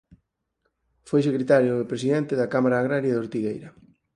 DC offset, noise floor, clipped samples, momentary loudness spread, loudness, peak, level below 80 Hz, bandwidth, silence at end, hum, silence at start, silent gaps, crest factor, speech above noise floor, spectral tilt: under 0.1%; -75 dBFS; under 0.1%; 9 LU; -23 LUFS; -6 dBFS; -64 dBFS; 10 kHz; 0.45 s; none; 1.05 s; none; 18 dB; 53 dB; -7.5 dB/octave